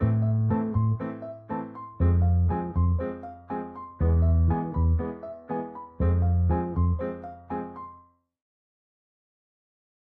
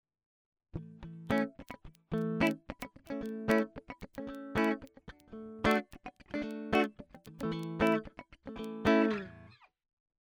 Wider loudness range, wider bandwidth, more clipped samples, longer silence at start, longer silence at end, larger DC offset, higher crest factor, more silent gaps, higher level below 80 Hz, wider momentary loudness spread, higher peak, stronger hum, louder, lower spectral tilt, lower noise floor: about the same, 5 LU vs 3 LU; second, 2.5 kHz vs 16.5 kHz; neither; second, 0 s vs 0.75 s; first, 2.05 s vs 0.7 s; neither; second, 14 dB vs 22 dB; neither; first, -34 dBFS vs -56 dBFS; second, 16 LU vs 20 LU; about the same, -12 dBFS vs -12 dBFS; neither; first, -27 LUFS vs -34 LUFS; first, -13 dB/octave vs -6.5 dB/octave; about the same, -55 dBFS vs -57 dBFS